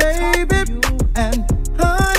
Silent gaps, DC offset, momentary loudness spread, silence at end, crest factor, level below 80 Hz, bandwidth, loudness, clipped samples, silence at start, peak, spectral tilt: none; under 0.1%; 4 LU; 0 s; 14 dB; -18 dBFS; 16 kHz; -18 LUFS; under 0.1%; 0 s; 0 dBFS; -4.5 dB/octave